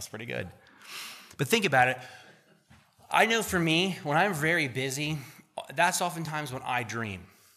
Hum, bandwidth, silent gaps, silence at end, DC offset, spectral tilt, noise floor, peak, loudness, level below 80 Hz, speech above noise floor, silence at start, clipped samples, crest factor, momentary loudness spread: none; 15.5 kHz; none; 0.3 s; under 0.1%; -3.5 dB/octave; -60 dBFS; -8 dBFS; -28 LUFS; -64 dBFS; 32 dB; 0 s; under 0.1%; 22 dB; 18 LU